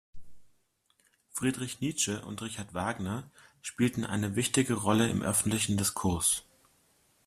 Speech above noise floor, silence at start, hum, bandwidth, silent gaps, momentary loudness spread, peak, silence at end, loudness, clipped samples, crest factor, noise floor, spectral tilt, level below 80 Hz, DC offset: 41 dB; 0.15 s; none; 15 kHz; none; 11 LU; -12 dBFS; 0.85 s; -30 LUFS; under 0.1%; 20 dB; -72 dBFS; -4 dB/octave; -60 dBFS; under 0.1%